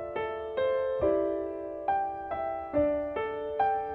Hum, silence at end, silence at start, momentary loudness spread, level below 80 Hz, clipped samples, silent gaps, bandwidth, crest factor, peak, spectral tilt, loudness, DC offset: none; 0 s; 0 s; 7 LU; -54 dBFS; under 0.1%; none; 4.6 kHz; 14 dB; -16 dBFS; -8.5 dB/octave; -31 LUFS; under 0.1%